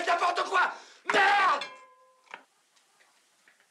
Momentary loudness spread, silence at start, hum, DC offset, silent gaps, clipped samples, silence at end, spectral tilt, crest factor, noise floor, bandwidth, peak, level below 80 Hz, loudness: 12 LU; 0 s; none; under 0.1%; none; under 0.1%; 1.35 s; -1 dB/octave; 16 dB; -67 dBFS; 12.5 kHz; -14 dBFS; under -90 dBFS; -26 LUFS